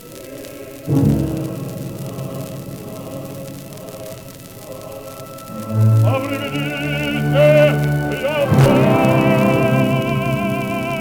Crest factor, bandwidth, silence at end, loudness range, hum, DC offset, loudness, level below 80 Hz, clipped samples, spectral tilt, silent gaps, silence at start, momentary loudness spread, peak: 18 dB; 19.5 kHz; 0 s; 16 LU; none; 0.2%; -17 LUFS; -42 dBFS; under 0.1%; -7 dB/octave; none; 0 s; 20 LU; 0 dBFS